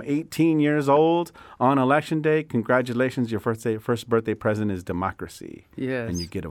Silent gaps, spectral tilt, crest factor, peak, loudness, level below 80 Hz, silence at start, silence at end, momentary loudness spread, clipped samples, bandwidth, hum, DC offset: none; -6.5 dB/octave; 18 dB; -6 dBFS; -23 LUFS; -56 dBFS; 0 s; 0 s; 11 LU; under 0.1%; 17 kHz; none; under 0.1%